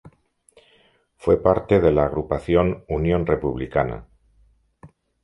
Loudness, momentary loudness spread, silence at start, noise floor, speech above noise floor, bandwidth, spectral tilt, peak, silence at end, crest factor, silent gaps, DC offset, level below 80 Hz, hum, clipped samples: -21 LUFS; 8 LU; 0.05 s; -60 dBFS; 40 dB; 11 kHz; -9 dB/octave; -2 dBFS; 0.35 s; 20 dB; none; under 0.1%; -38 dBFS; none; under 0.1%